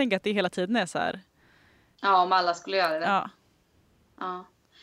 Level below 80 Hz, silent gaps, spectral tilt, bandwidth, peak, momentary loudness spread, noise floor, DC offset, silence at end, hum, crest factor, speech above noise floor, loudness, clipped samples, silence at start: -72 dBFS; none; -4.5 dB/octave; 13.5 kHz; -10 dBFS; 15 LU; -65 dBFS; under 0.1%; 0.4 s; none; 18 dB; 39 dB; -26 LUFS; under 0.1%; 0 s